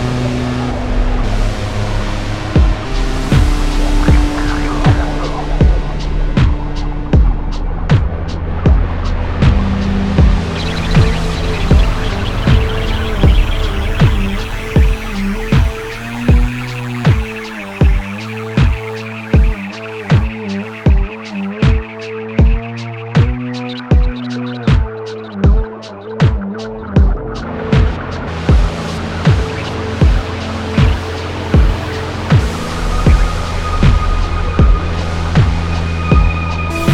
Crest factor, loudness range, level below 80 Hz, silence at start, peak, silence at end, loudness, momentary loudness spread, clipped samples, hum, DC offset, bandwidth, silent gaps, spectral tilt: 14 dB; 2 LU; -16 dBFS; 0 s; 0 dBFS; 0 s; -16 LUFS; 9 LU; under 0.1%; none; under 0.1%; 12 kHz; none; -7 dB/octave